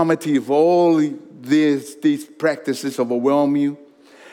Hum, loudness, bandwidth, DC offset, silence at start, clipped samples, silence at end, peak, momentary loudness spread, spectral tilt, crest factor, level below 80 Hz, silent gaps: none; -19 LUFS; 15.5 kHz; under 0.1%; 0 s; under 0.1%; 0.6 s; -4 dBFS; 9 LU; -6 dB/octave; 14 dB; -82 dBFS; none